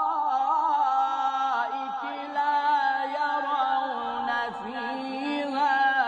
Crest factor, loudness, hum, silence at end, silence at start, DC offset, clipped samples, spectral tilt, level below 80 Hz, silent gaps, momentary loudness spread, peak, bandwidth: 14 dB; -26 LUFS; none; 0 s; 0 s; under 0.1%; under 0.1%; -3 dB/octave; -72 dBFS; none; 8 LU; -12 dBFS; 8.2 kHz